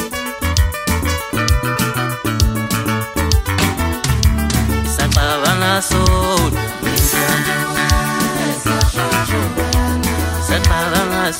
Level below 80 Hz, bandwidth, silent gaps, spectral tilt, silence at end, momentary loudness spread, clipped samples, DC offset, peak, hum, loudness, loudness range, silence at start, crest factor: -22 dBFS; 16.5 kHz; none; -4 dB/octave; 0 s; 4 LU; under 0.1%; under 0.1%; -2 dBFS; none; -16 LUFS; 2 LU; 0 s; 14 dB